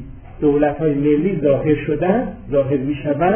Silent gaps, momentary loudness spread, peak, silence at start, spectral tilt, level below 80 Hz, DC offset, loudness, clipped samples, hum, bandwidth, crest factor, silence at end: none; 4 LU; -2 dBFS; 0 s; -12 dB/octave; -38 dBFS; under 0.1%; -18 LUFS; under 0.1%; none; 3.5 kHz; 16 dB; 0 s